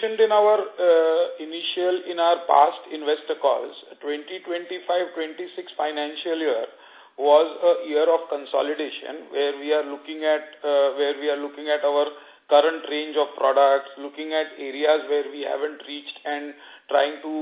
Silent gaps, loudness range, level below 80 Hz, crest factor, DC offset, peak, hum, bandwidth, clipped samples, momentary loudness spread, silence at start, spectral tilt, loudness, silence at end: none; 6 LU; -80 dBFS; 20 dB; under 0.1%; -4 dBFS; none; 4 kHz; under 0.1%; 13 LU; 0 s; -6 dB/octave; -23 LUFS; 0 s